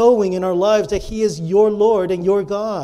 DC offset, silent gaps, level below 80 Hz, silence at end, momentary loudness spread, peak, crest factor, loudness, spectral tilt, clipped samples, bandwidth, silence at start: under 0.1%; none; -42 dBFS; 0 s; 7 LU; -2 dBFS; 14 dB; -17 LUFS; -6 dB/octave; under 0.1%; 12 kHz; 0 s